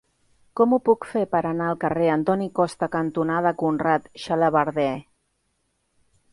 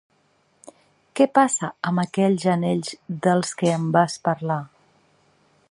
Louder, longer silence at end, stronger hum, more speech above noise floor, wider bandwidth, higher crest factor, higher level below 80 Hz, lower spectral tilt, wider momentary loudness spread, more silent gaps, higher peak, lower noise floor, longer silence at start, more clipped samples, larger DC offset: about the same, -23 LUFS vs -22 LUFS; first, 1.3 s vs 1.05 s; neither; first, 50 dB vs 43 dB; about the same, 11.5 kHz vs 11.5 kHz; about the same, 18 dB vs 20 dB; first, -62 dBFS vs -68 dBFS; first, -7 dB/octave vs -5.5 dB/octave; second, 5 LU vs 8 LU; neither; about the same, -4 dBFS vs -2 dBFS; first, -72 dBFS vs -64 dBFS; second, 0.55 s vs 1.15 s; neither; neither